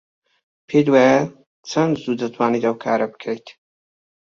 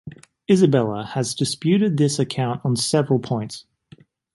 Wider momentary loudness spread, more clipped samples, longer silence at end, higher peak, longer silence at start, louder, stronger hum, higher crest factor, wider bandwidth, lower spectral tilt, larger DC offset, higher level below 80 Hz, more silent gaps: about the same, 15 LU vs 13 LU; neither; about the same, 0.85 s vs 0.75 s; about the same, -2 dBFS vs -4 dBFS; first, 0.7 s vs 0.05 s; about the same, -19 LUFS vs -20 LUFS; neither; about the same, 18 dB vs 18 dB; second, 7.4 kHz vs 11.5 kHz; about the same, -6 dB/octave vs -5.5 dB/octave; neither; about the same, -62 dBFS vs -60 dBFS; first, 1.46-1.63 s vs none